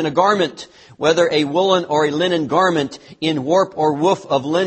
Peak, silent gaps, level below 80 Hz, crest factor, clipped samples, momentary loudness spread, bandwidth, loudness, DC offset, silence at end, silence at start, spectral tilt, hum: 0 dBFS; none; -60 dBFS; 16 dB; under 0.1%; 6 LU; 8.8 kHz; -17 LUFS; under 0.1%; 0 s; 0 s; -5 dB/octave; none